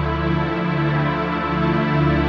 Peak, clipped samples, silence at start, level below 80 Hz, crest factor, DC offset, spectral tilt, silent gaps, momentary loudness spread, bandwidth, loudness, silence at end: -6 dBFS; under 0.1%; 0 s; -32 dBFS; 12 dB; under 0.1%; -9 dB/octave; none; 3 LU; 6 kHz; -20 LUFS; 0 s